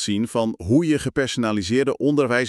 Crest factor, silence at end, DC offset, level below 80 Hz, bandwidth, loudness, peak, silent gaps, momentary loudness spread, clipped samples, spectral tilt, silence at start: 14 dB; 0 s; under 0.1%; -50 dBFS; 12.5 kHz; -21 LUFS; -6 dBFS; none; 4 LU; under 0.1%; -5.5 dB/octave; 0 s